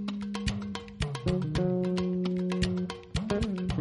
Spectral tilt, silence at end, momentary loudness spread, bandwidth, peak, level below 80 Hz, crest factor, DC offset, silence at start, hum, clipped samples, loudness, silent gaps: -6.5 dB/octave; 0 s; 6 LU; 11.5 kHz; -16 dBFS; -42 dBFS; 16 dB; under 0.1%; 0 s; none; under 0.1%; -31 LUFS; none